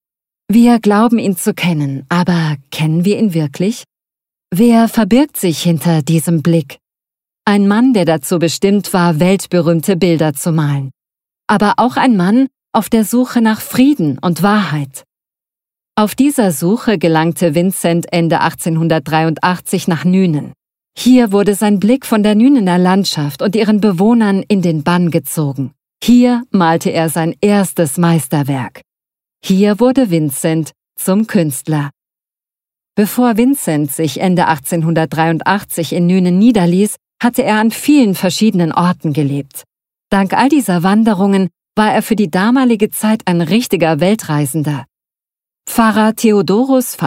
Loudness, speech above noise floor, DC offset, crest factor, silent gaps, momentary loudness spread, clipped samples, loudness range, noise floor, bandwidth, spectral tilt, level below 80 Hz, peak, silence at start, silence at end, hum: -13 LUFS; over 78 dB; under 0.1%; 12 dB; none; 8 LU; under 0.1%; 3 LU; under -90 dBFS; 16.5 kHz; -6 dB/octave; -50 dBFS; 0 dBFS; 0.5 s; 0 s; none